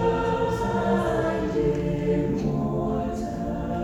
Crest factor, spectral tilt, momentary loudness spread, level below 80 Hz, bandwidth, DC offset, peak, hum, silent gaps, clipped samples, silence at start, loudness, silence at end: 14 dB; -7.5 dB/octave; 6 LU; -38 dBFS; 13.5 kHz; under 0.1%; -12 dBFS; none; none; under 0.1%; 0 s; -25 LUFS; 0 s